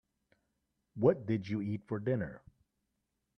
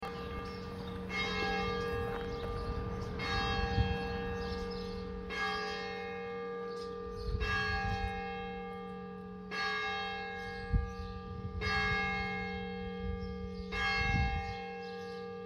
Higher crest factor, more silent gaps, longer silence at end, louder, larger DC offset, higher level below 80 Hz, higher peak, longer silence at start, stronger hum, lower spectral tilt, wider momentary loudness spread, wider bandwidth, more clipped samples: about the same, 22 dB vs 20 dB; neither; first, 1 s vs 0 s; first, -34 LUFS vs -37 LUFS; neither; second, -68 dBFS vs -44 dBFS; first, -14 dBFS vs -18 dBFS; first, 0.95 s vs 0 s; neither; first, -9.5 dB/octave vs -5.5 dB/octave; about the same, 10 LU vs 10 LU; second, 6.4 kHz vs 13.5 kHz; neither